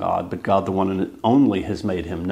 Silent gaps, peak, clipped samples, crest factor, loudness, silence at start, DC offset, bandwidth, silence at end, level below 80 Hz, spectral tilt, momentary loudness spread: none; -4 dBFS; under 0.1%; 16 dB; -21 LUFS; 0 s; under 0.1%; 9.6 kHz; 0 s; -48 dBFS; -8 dB/octave; 8 LU